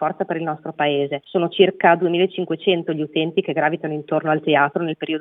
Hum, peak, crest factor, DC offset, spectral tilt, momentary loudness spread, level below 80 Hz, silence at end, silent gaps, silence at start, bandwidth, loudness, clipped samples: none; 0 dBFS; 20 dB; under 0.1%; -9 dB/octave; 8 LU; -80 dBFS; 0 s; none; 0 s; 3.9 kHz; -20 LUFS; under 0.1%